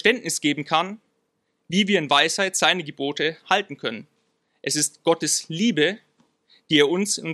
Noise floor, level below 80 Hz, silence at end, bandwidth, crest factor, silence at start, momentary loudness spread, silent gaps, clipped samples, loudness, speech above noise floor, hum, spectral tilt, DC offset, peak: -73 dBFS; -72 dBFS; 0 s; 14.5 kHz; 20 dB; 0.05 s; 12 LU; none; under 0.1%; -22 LUFS; 51 dB; none; -2.5 dB/octave; under 0.1%; -2 dBFS